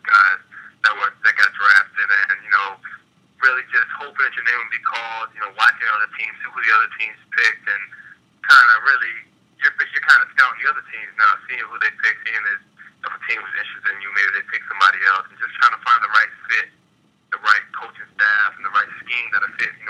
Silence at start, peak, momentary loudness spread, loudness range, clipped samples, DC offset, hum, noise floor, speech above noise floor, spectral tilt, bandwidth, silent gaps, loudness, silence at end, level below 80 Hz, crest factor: 0.05 s; 0 dBFS; 14 LU; 5 LU; under 0.1%; under 0.1%; none; -60 dBFS; 40 dB; 0.5 dB/octave; 13 kHz; none; -17 LUFS; 0 s; -78 dBFS; 20 dB